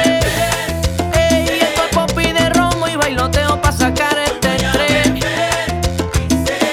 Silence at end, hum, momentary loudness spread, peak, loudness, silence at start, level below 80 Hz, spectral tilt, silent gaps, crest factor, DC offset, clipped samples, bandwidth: 0 s; none; 4 LU; 0 dBFS; -15 LUFS; 0 s; -26 dBFS; -4 dB/octave; none; 14 dB; under 0.1%; under 0.1%; 19 kHz